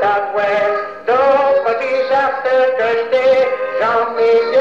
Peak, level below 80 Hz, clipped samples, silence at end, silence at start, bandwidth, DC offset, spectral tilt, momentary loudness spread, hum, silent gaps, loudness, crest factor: -4 dBFS; -58 dBFS; under 0.1%; 0 s; 0 s; 7.2 kHz; 0.4%; -4.5 dB/octave; 5 LU; none; none; -15 LUFS; 10 dB